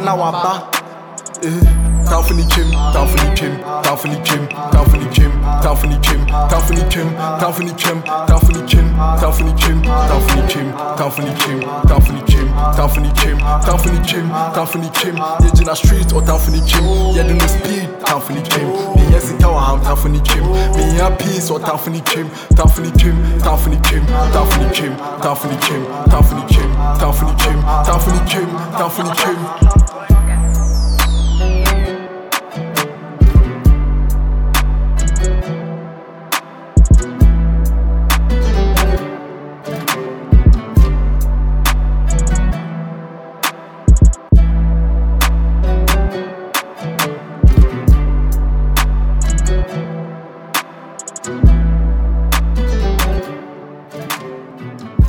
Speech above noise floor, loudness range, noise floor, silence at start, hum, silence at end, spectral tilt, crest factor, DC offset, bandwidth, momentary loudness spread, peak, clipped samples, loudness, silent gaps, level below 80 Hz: 21 dB; 3 LU; -33 dBFS; 0 s; none; 0 s; -5 dB/octave; 12 dB; under 0.1%; 20 kHz; 10 LU; 0 dBFS; under 0.1%; -15 LUFS; none; -14 dBFS